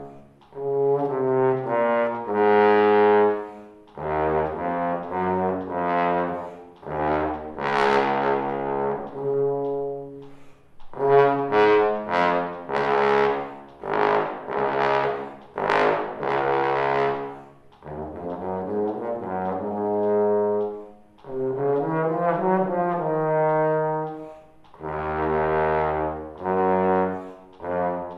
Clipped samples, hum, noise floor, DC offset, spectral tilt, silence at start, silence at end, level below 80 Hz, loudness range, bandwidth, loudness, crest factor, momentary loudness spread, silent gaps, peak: under 0.1%; none; -47 dBFS; under 0.1%; -7.5 dB/octave; 0 s; 0 s; -52 dBFS; 5 LU; 6.6 kHz; -23 LUFS; 20 dB; 15 LU; none; -2 dBFS